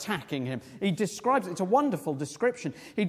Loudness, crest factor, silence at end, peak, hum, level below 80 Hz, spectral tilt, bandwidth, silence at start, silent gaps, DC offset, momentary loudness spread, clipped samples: -29 LUFS; 18 dB; 0 s; -12 dBFS; none; -70 dBFS; -5.5 dB/octave; 16 kHz; 0 s; none; under 0.1%; 9 LU; under 0.1%